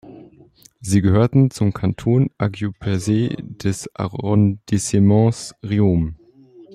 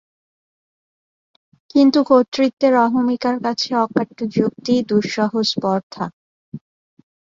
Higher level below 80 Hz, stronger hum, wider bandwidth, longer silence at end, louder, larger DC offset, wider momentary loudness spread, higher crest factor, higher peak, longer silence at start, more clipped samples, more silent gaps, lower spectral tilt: first, -46 dBFS vs -62 dBFS; neither; first, 13 kHz vs 7.6 kHz; second, 0.1 s vs 0.65 s; about the same, -19 LUFS vs -18 LUFS; neither; second, 10 LU vs 14 LU; about the same, 16 dB vs 18 dB; about the same, -4 dBFS vs -2 dBFS; second, 0.05 s vs 1.75 s; neither; second, none vs 2.28-2.32 s, 2.53-2.57 s, 5.83-5.90 s, 6.13-6.52 s; first, -7 dB/octave vs -5.5 dB/octave